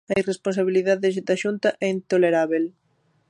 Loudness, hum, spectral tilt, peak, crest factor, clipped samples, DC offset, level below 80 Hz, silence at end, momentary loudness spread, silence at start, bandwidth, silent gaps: -22 LUFS; none; -6 dB/octave; -6 dBFS; 16 dB; under 0.1%; under 0.1%; -64 dBFS; 0.6 s; 6 LU; 0.1 s; 11 kHz; none